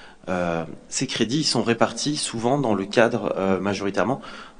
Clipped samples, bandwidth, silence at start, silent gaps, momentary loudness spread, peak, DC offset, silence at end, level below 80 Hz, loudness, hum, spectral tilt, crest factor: under 0.1%; 10 kHz; 0 s; none; 7 LU; -2 dBFS; under 0.1%; 0.1 s; -56 dBFS; -23 LUFS; none; -4 dB/octave; 22 dB